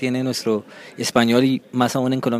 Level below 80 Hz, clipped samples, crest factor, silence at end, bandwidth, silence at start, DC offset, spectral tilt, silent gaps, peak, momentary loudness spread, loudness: -62 dBFS; under 0.1%; 20 dB; 0 s; 15.5 kHz; 0 s; under 0.1%; -5 dB/octave; none; 0 dBFS; 9 LU; -20 LUFS